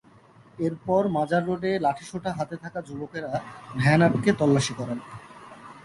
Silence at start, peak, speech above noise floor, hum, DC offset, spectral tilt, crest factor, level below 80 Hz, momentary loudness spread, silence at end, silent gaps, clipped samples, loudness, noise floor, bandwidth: 0.6 s; -6 dBFS; 29 dB; none; under 0.1%; -6.5 dB/octave; 20 dB; -58 dBFS; 16 LU; 0.05 s; none; under 0.1%; -25 LUFS; -54 dBFS; 11.5 kHz